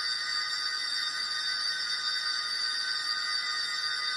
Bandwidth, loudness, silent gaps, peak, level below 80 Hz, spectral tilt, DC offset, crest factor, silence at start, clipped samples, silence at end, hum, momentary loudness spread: 11.5 kHz; -29 LUFS; none; -18 dBFS; -76 dBFS; 2.5 dB/octave; under 0.1%; 12 dB; 0 s; under 0.1%; 0 s; none; 1 LU